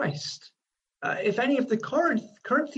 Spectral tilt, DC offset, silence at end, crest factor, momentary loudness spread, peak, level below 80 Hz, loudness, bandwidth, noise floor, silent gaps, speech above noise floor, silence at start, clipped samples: -5.5 dB/octave; under 0.1%; 0 s; 16 dB; 10 LU; -12 dBFS; -74 dBFS; -27 LUFS; 8.6 kHz; -83 dBFS; none; 57 dB; 0 s; under 0.1%